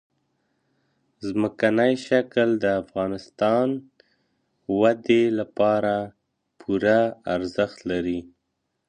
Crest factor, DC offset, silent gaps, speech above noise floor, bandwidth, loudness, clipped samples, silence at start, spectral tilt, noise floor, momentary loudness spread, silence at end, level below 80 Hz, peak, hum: 18 dB; under 0.1%; none; 55 dB; 9.6 kHz; -23 LUFS; under 0.1%; 1.2 s; -6.5 dB/octave; -77 dBFS; 9 LU; 0.6 s; -58 dBFS; -6 dBFS; none